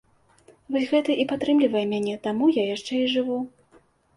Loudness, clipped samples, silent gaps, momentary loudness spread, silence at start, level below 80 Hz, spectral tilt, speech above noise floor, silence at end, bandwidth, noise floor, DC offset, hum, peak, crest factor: -24 LUFS; under 0.1%; none; 8 LU; 0.7 s; -66 dBFS; -5.5 dB/octave; 36 dB; 0.7 s; 11.5 kHz; -59 dBFS; under 0.1%; none; -10 dBFS; 16 dB